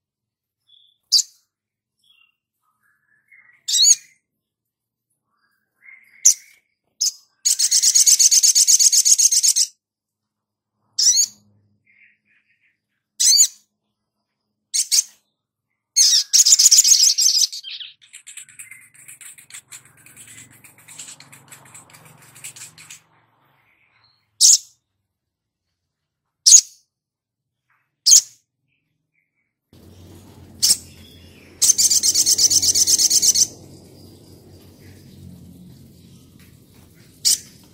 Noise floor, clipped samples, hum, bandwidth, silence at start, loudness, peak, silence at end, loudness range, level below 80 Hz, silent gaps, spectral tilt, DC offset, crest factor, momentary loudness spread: -85 dBFS; under 0.1%; none; 16.5 kHz; 1.1 s; -13 LUFS; 0 dBFS; 0.35 s; 10 LU; -66 dBFS; none; 3 dB/octave; under 0.1%; 20 dB; 13 LU